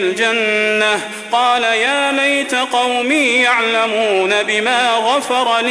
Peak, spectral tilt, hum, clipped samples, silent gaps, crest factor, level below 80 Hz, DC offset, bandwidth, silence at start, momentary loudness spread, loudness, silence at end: -2 dBFS; -1.5 dB/octave; none; under 0.1%; none; 12 dB; -60 dBFS; under 0.1%; 11 kHz; 0 s; 3 LU; -14 LUFS; 0 s